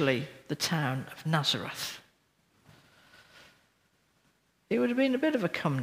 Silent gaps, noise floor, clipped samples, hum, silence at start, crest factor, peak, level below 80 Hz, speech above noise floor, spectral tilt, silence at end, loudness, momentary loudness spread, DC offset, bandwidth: none; -71 dBFS; under 0.1%; none; 0 s; 22 dB; -10 dBFS; -74 dBFS; 41 dB; -5 dB/octave; 0 s; -30 LUFS; 10 LU; under 0.1%; 16 kHz